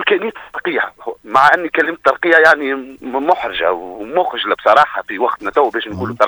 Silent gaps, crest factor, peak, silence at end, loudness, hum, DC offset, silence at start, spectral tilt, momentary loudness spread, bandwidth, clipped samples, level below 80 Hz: none; 16 dB; 0 dBFS; 0 s; -15 LUFS; none; under 0.1%; 0 s; -4.5 dB/octave; 13 LU; over 20 kHz; 0.1%; -54 dBFS